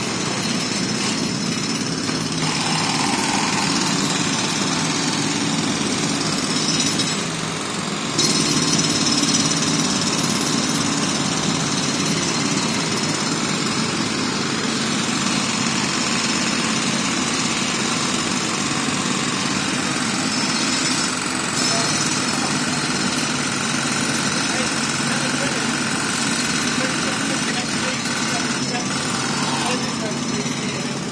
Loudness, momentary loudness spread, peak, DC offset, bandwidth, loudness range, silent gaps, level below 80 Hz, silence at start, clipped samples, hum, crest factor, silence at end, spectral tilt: -19 LUFS; 4 LU; -4 dBFS; under 0.1%; 11 kHz; 2 LU; none; -54 dBFS; 0 s; under 0.1%; none; 18 dB; 0 s; -2.5 dB/octave